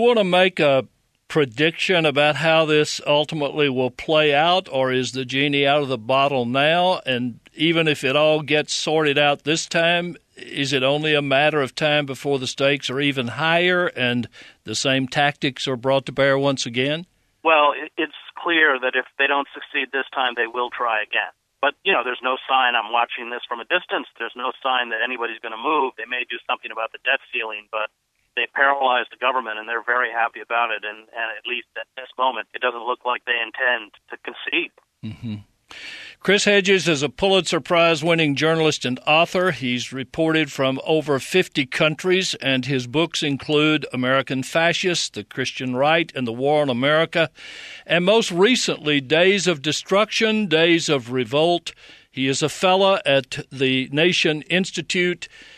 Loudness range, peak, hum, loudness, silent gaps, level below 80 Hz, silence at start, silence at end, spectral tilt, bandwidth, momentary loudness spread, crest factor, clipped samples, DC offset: 5 LU; -2 dBFS; none; -20 LUFS; none; -62 dBFS; 0 s; 0.15 s; -4 dB/octave; 13.5 kHz; 11 LU; 18 dB; under 0.1%; under 0.1%